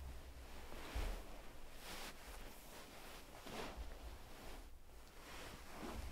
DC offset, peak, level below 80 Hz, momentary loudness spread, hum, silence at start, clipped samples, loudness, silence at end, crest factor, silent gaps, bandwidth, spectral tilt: under 0.1%; -34 dBFS; -54 dBFS; 9 LU; none; 0 s; under 0.1%; -54 LUFS; 0 s; 18 dB; none; 16 kHz; -4 dB/octave